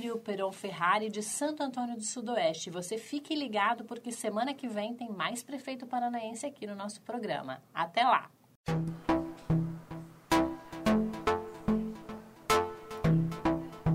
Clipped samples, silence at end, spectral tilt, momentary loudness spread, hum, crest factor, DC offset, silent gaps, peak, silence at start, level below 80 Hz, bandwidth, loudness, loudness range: under 0.1%; 0 s; -5 dB/octave; 11 LU; none; 20 dB; under 0.1%; 8.56-8.64 s; -14 dBFS; 0 s; -54 dBFS; 16 kHz; -33 LUFS; 5 LU